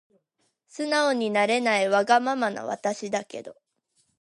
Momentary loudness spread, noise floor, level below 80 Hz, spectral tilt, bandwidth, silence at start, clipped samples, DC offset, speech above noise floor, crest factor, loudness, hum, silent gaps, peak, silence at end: 13 LU; -74 dBFS; -80 dBFS; -3.5 dB/octave; 11.5 kHz; 0.75 s; under 0.1%; under 0.1%; 50 dB; 18 dB; -24 LUFS; none; none; -8 dBFS; 0.7 s